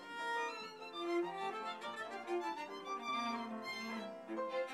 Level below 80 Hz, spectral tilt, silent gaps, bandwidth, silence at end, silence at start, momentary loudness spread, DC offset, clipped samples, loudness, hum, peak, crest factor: under -90 dBFS; -3.5 dB/octave; none; 14.5 kHz; 0 s; 0 s; 6 LU; under 0.1%; under 0.1%; -42 LUFS; none; -28 dBFS; 14 dB